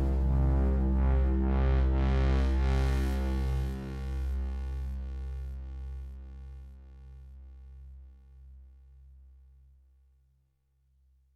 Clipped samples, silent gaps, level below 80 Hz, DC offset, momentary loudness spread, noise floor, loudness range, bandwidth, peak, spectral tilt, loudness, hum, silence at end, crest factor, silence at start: under 0.1%; none; -32 dBFS; under 0.1%; 23 LU; -72 dBFS; 24 LU; 6 kHz; -18 dBFS; -8.5 dB/octave; -31 LUFS; none; 2.65 s; 12 dB; 0 s